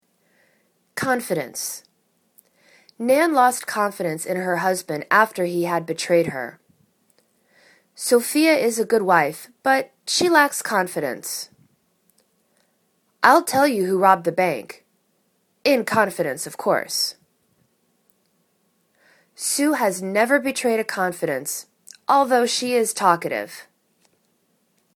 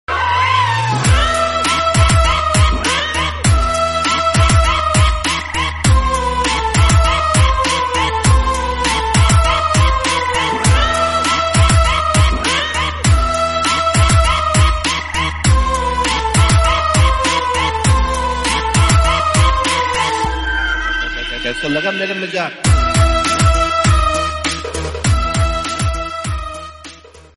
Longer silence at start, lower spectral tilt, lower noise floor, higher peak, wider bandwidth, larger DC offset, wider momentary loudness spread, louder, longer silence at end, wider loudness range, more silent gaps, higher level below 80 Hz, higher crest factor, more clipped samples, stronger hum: first, 0.95 s vs 0.1 s; about the same, -3 dB/octave vs -4 dB/octave; first, -67 dBFS vs -38 dBFS; about the same, 0 dBFS vs -2 dBFS; first, 19 kHz vs 11.5 kHz; second, under 0.1% vs 0.7%; first, 12 LU vs 7 LU; second, -20 LUFS vs -14 LUFS; first, 1.35 s vs 0.15 s; first, 5 LU vs 2 LU; neither; second, -70 dBFS vs -20 dBFS; first, 22 dB vs 12 dB; neither; neither